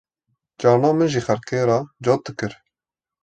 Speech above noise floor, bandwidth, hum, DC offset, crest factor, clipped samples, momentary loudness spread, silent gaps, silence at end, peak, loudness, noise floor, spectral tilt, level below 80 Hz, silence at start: 70 dB; 9 kHz; none; under 0.1%; 18 dB; under 0.1%; 12 LU; none; 0.7 s; -4 dBFS; -20 LUFS; -90 dBFS; -6.5 dB/octave; -58 dBFS; 0.6 s